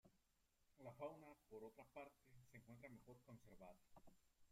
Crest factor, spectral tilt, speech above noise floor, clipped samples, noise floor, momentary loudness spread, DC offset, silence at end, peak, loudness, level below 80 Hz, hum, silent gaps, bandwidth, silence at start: 22 dB; -6.5 dB/octave; 22 dB; under 0.1%; -84 dBFS; 10 LU; under 0.1%; 0 s; -42 dBFS; -62 LUFS; -82 dBFS; none; none; 15.5 kHz; 0.05 s